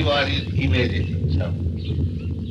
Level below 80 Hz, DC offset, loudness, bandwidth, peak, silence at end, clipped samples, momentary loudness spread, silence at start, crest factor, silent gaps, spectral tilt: -32 dBFS; under 0.1%; -23 LUFS; 6.8 kHz; -8 dBFS; 0 s; under 0.1%; 6 LU; 0 s; 14 dB; none; -7 dB/octave